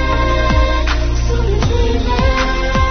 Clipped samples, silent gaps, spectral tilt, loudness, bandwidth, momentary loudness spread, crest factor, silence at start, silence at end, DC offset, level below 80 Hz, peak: under 0.1%; none; -5.5 dB/octave; -16 LUFS; 6.6 kHz; 3 LU; 12 dB; 0 s; 0 s; under 0.1%; -16 dBFS; -2 dBFS